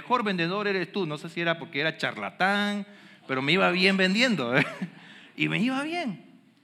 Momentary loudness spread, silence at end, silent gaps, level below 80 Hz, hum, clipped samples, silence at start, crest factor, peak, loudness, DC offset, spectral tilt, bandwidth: 14 LU; 0.45 s; none; under -90 dBFS; none; under 0.1%; 0 s; 20 dB; -6 dBFS; -26 LUFS; under 0.1%; -5 dB/octave; 13 kHz